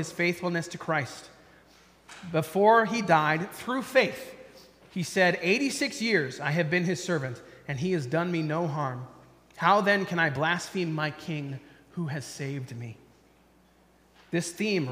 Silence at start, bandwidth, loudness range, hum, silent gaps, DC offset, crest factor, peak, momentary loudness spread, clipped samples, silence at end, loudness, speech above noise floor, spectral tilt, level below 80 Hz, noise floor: 0 s; 15.5 kHz; 8 LU; none; none; under 0.1%; 22 dB; -6 dBFS; 17 LU; under 0.1%; 0 s; -27 LUFS; 34 dB; -5 dB/octave; -68 dBFS; -61 dBFS